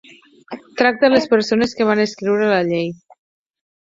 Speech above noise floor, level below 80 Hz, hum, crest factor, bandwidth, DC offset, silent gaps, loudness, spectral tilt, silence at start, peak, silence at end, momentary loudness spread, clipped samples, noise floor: 22 dB; -58 dBFS; none; 16 dB; 7.8 kHz; under 0.1%; none; -17 LUFS; -5.5 dB/octave; 0.5 s; -2 dBFS; 0.95 s; 15 LU; under 0.1%; -38 dBFS